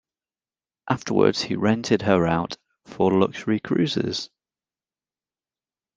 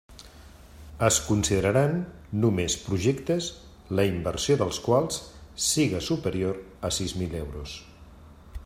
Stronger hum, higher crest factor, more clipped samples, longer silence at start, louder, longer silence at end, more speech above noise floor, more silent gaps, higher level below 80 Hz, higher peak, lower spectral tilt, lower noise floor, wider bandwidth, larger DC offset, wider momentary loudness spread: neither; about the same, 22 dB vs 18 dB; neither; first, 0.85 s vs 0.1 s; first, -22 LUFS vs -26 LUFS; first, 1.7 s vs 0 s; first, over 68 dB vs 23 dB; neither; second, -58 dBFS vs -46 dBFS; first, -4 dBFS vs -8 dBFS; first, -6 dB/octave vs -4.5 dB/octave; first, under -90 dBFS vs -49 dBFS; second, 9.4 kHz vs 16 kHz; neither; second, 9 LU vs 12 LU